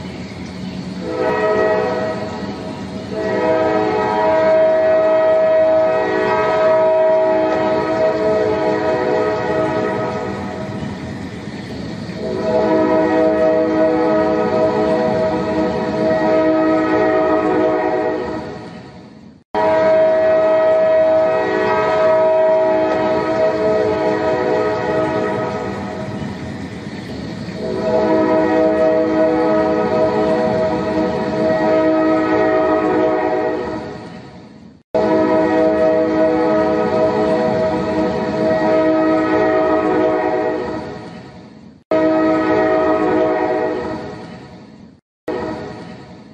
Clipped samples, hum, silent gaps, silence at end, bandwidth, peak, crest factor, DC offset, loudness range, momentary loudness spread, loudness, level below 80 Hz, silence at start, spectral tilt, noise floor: under 0.1%; none; 19.45-19.54 s, 34.84-34.94 s, 41.85-41.91 s, 45.02-45.27 s; 0.05 s; 8.6 kHz; -4 dBFS; 14 dB; under 0.1%; 6 LU; 14 LU; -16 LUFS; -46 dBFS; 0 s; -7 dB/octave; -39 dBFS